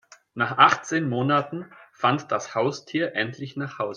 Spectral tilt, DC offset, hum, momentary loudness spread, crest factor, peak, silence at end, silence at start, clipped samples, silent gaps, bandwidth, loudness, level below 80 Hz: -5 dB/octave; under 0.1%; none; 15 LU; 24 dB; -2 dBFS; 0 s; 0.35 s; under 0.1%; none; 10 kHz; -24 LUFS; -72 dBFS